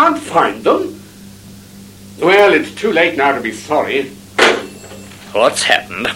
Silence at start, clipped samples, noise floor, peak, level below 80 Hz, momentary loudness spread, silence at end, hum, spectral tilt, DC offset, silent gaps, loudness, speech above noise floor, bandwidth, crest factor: 0 s; under 0.1%; -37 dBFS; 0 dBFS; -52 dBFS; 17 LU; 0 s; none; -3 dB/octave; under 0.1%; none; -14 LUFS; 23 dB; 16.5 kHz; 16 dB